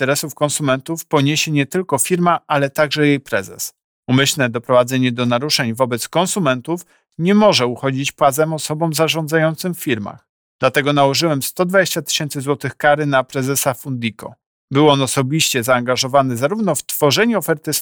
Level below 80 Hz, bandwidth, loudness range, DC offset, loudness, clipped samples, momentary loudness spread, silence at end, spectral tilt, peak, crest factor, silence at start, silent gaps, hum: -60 dBFS; over 20 kHz; 1 LU; under 0.1%; -17 LUFS; under 0.1%; 8 LU; 0 s; -4 dB/octave; -2 dBFS; 16 dB; 0 s; 3.84-4.03 s, 10.29-10.59 s, 14.46-14.68 s; none